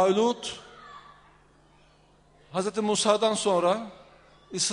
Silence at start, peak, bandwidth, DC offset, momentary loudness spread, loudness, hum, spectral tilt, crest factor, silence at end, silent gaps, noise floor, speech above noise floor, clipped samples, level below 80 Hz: 0 s; -8 dBFS; 10.5 kHz; under 0.1%; 23 LU; -26 LUFS; none; -3.5 dB/octave; 20 dB; 0 s; none; -59 dBFS; 35 dB; under 0.1%; -66 dBFS